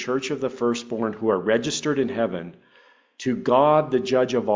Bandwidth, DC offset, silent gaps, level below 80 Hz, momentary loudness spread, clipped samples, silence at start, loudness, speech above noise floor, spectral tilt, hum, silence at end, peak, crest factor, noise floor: 7.6 kHz; under 0.1%; none; -62 dBFS; 9 LU; under 0.1%; 0 s; -23 LUFS; 34 dB; -5 dB/octave; none; 0 s; -6 dBFS; 16 dB; -56 dBFS